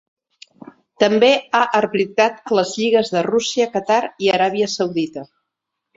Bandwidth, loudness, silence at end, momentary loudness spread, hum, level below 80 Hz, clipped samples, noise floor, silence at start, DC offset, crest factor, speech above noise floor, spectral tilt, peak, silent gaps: 7.8 kHz; -18 LUFS; 0.7 s; 6 LU; none; -64 dBFS; under 0.1%; -79 dBFS; 1 s; under 0.1%; 18 dB; 62 dB; -4 dB/octave; 0 dBFS; none